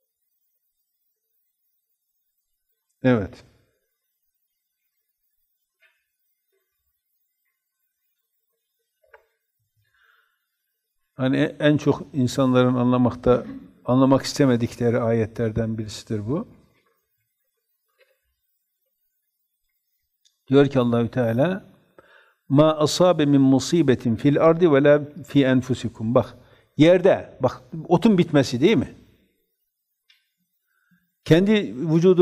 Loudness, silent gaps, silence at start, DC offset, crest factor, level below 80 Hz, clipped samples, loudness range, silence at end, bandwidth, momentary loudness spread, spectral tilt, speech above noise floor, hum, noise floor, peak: -20 LUFS; none; 3.05 s; under 0.1%; 20 dB; -54 dBFS; under 0.1%; 12 LU; 0 s; 14.5 kHz; 11 LU; -7 dB/octave; 59 dB; none; -78 dBFS; -4 dBFS